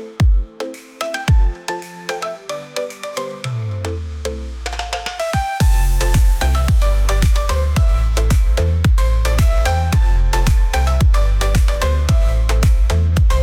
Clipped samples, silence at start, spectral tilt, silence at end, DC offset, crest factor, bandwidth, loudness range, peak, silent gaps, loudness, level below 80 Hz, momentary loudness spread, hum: under 0.1%; 0 s; -5.5 dB/octave; 0 s; under 0.1%; 10 dB; 15.5 kHz; 8 LU; -6 dBFS; none; -18 LUFS; -16 dBFS; 10 LU; none